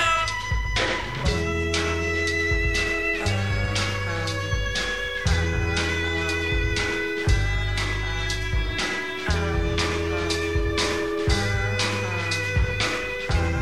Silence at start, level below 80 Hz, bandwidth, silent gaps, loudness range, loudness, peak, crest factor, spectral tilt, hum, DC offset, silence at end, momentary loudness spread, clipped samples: 0 s; -30 dBFS; 14.5 kHz; none; 1 LU; -24 LUFS; -8 dBFS; 16 dB; -4.5 dB/octave; none; 0.7%; 0 s; 3 LU; under 0.1%